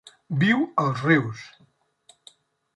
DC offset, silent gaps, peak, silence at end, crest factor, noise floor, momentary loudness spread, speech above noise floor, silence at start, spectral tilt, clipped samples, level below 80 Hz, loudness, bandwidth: under 0.1%; none; -6 dBFS; 1.3 s; 20 dB; -62 dBFS; 13 LU; 39 dB; 0.3 s; -7 dB/octave; under 0.1%; -66 dBFS; -23 LUFS; 11 kHz